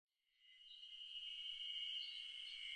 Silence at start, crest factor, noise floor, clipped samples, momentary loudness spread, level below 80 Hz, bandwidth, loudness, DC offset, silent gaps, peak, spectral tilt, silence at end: 0.4 s; 14 dB; -73 dBFS; under 0.1%; 15 LU; -88 dBFS; 10 kHz; -48 LUFS; under 0.1%; none; -38 dBFS; 4.5 dB/octave; 0 s